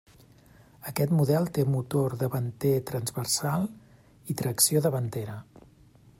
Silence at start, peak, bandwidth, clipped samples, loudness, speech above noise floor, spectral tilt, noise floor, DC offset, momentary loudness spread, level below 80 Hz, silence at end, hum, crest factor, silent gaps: 0.8 s; -8 dBFS; 16 kHz; under 0.1%; -27 LUFS; 29 dB; -5 dB/octave; -56 dBFS; under 0.1%; 14 LU; -62 dBFS; 0.8 s; none; 20 dB; none